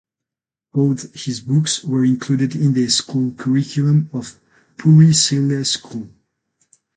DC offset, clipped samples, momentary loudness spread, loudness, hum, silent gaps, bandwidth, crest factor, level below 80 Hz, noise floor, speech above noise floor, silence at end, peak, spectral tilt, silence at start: under 0.1%; under 0.1%; 14 LU; -17 LUFS; none; none; 9.4 kHz; 16 dB; -58 dBFS; -87 dBFS; 71 dB; 0.9 s; -2 dBFS; -5 dB/octave; 0.75 s